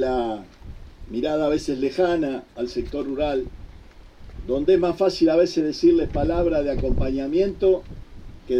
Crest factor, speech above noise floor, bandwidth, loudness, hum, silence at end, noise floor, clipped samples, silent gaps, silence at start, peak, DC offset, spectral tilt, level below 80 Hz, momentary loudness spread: 16 dB; 23 dB; 9.6 kHz; -22 LUFS; none; 0 s; -45 dBFS; under 0.1%; none; 0 s; -8 dBFS; under 0.1%; -7 dB/octave; -36 dBFS; 11 LU